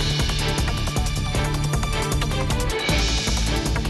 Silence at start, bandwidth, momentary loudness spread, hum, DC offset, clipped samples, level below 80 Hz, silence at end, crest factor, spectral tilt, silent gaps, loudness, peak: 0 s; 12.5 kHz; 3 LU; none; under 0.1%; under 0.1%; -26 dBFS; 0 s; 14 dB; -4 dB/octave; none; -23 LUFS; -8 dBFS